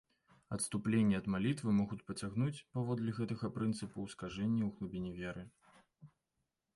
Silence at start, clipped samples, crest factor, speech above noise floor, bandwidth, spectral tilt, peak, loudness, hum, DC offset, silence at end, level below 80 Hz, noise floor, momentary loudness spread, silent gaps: 0.5 s; under 0.1%; 16 dB; 50 dB; 11.5 kHz; -6 dB/octave; -22 dBFS; -38 LUFS; none; under 0.1%; 0.7 s; -64 dBFS; -87 dBFS; 11 LU; none